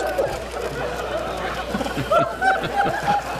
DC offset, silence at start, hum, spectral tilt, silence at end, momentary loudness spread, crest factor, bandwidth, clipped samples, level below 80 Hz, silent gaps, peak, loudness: under 0.1%; 0 s; none; -4.5 dB/octave; 0 s; 7 LU; 16 dB; 15.5 kHz; under 0.1%; -40 dBFS; none; -6 dBFS; -23 LUFS